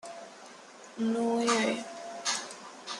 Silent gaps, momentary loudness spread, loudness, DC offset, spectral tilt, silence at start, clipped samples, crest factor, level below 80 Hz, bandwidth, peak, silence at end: none; 21 LU; -31 LUFS; under 0.1%; -2.5 dB/octave; 0.05 s; under 0.1%; 20 dB; -80 dBFS; 12 kHz; -12 dBFS; 0 s